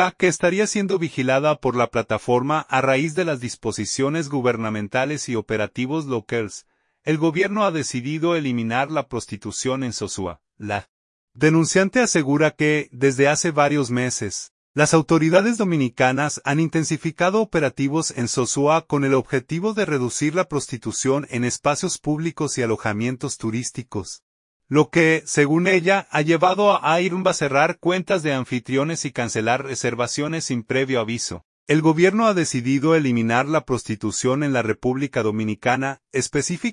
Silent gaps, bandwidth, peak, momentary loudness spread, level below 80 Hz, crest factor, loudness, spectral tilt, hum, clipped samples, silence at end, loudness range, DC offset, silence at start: 10.89-11.28 s, 14.51-14.74 s, 24.22-24.60 s, 31.45-31.67 s; 11 kHz; -2 dBFS; 9 LU; -58 dBFS; 18 dB; -21 LUFS; -5 dB/octave; none; under 0.1%; 0 s; 5 LU; under 0.1%; 0 s